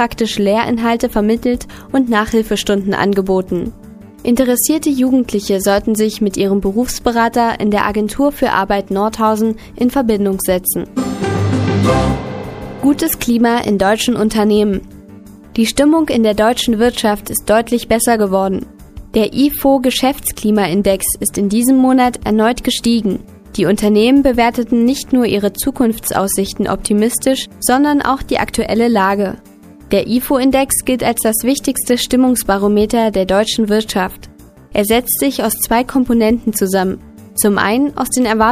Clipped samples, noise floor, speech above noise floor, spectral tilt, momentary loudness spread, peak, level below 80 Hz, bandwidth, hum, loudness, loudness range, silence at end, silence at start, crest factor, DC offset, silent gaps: under 0.1%; -37 dBFS; 23 dB; -4.5 dB/octave; 6 LU; 0 dBFS; -36 dBFS; 15.5 kHz; none; -14 LUFS; 2 LU; 0 s; 0 s; 14 dB; under 0.1%; none